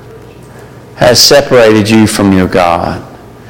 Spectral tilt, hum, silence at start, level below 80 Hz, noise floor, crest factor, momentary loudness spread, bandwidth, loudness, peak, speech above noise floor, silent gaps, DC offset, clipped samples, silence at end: -4 dB/octave; none; 0.05 s; -36 dBFS; -31 dBFS; 8 dB; 9 LU; over 20 kHz; -6 LUFS; 0 dBFS; 25 dB; none; under 0.1%; 0.6%; 0 s